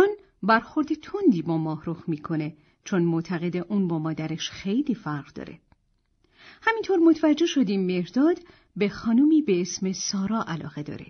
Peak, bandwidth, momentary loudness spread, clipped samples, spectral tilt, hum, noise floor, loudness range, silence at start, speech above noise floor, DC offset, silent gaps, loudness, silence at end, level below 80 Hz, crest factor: -8 dBFS; 6.6 kHz; 12 LU; under 0.1%; -5.5 dB/octave; none; -69 dBFS; 6 LU; 0 s; 45 dB; under 0.1%; none; -25 LUFS; 0.05 s; -62 dBFS; 18 dB